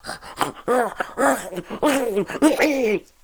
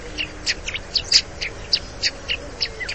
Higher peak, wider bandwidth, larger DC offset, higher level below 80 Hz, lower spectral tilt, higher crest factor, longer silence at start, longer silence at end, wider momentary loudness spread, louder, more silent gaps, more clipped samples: about the same, -4 dBFS vs -2 dBFS; first, over 20 kHz vs 8.8 kHz; second, under 0.1% vs 0.6%; second, -52 dBFS vs -40 dBFS; first, -4 dB/octave vs -0.5 dB/octave; about the same, 18 dB vs 22 dB; about the same, 0.05 s vs 0 s; first, 0.25 s vs 0 s; about the same, 9 LU vs 11 LU; about the same, -21 LUFS vs -21 LUFS; neither; neither